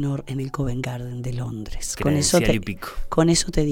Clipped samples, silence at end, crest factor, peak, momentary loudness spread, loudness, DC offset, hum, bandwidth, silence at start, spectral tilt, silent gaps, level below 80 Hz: under 0.1%; 0 s; 18 dB; -4 dBFS; 12 LU; -23 LUFS; under 0.1%; none; 17.5 kHz; 0 s; -4.5 dB/octave; none; -34 dBFS